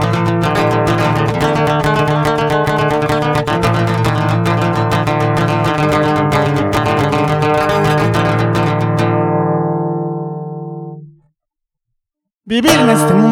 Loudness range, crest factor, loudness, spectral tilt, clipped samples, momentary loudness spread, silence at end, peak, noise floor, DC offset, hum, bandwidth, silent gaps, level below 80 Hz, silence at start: 5 LU; 14 dB; -14 LUFS; -6 dB/octave; under 0.1%; 6 LU; 0 s; 0 dBFS; -78 dBFS; under 0.1%; none; 17.5 kHz; 12.35-12.39 s; -38 dBFS; 0 s